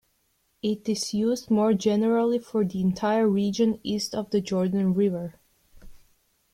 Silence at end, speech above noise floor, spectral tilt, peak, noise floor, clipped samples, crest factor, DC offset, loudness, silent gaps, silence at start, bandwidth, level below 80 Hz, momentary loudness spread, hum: 0.6 s; 46 dB; -6 dB/octave; -10 dBFS; -70 dBFS; under 0.1%; 16 dB; under 0.1%; -25 LUFS; none; 0.65 s; 14 kHz; -60 dBFS; 6 LU; none